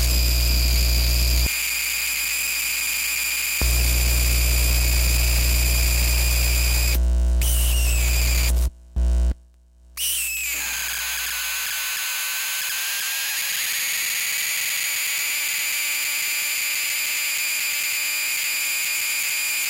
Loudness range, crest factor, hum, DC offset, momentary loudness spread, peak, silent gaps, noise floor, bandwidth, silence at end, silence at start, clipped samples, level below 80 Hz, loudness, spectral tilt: 4 LU; 14 dB; none; under 0.1%; 4 LU; -8 dBFS; none; -51 dBFS; 17.5 kHz; 0 s; 0 s; under 0.1%; -24 dBFS; -21 LUFS; -1.5 dB/octave